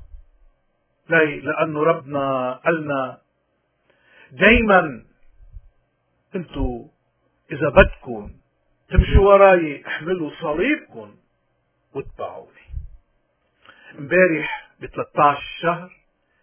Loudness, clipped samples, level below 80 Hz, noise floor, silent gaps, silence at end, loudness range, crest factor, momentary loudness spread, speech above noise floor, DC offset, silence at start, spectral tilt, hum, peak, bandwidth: -19 LUFS; under 0.1%; -32 dBFS; -69 dBFS; none; 0.55 s; 10 LU; 22 dB; 21 LU; 50 dB; under 0.1%; 0.15 s; -10 dB/octave; none; 0 dBFS; 3.5 kHz